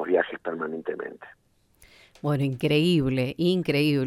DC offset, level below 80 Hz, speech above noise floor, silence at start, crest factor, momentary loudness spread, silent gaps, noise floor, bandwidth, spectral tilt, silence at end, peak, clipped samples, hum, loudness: under 0.1%; -56 dBFS; 33 dB; 0 s; 18 dB; 12 LU; none; -58 dBFS; 14.5 kHz; -7 dB/octave; 0 s; -8 dBFS; under 0.1%; none; -25 LUFS